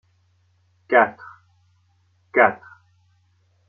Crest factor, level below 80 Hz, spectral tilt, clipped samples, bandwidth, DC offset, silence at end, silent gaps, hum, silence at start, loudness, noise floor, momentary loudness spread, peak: 22 dB; -74 dBFS; -3 dB/octave; under 0.1%; 4.8 kHz; under 0.1%; 1.15 s; none; none; 0.9 s; -19 LUFS; -63 dBFS; 20 LU; -2 dBFS